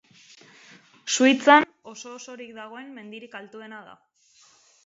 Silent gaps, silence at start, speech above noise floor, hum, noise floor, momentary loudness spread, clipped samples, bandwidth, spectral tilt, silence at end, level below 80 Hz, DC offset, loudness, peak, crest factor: none; 1.05 s; 35 dB; none; -59 dBFS; 24 LU; under 0.1%; 8 kHz; -2 dB/octave; 1.05 s; -78 dBFS; under 0.1%; -19 LUFS; -2 dBFS; 24 dB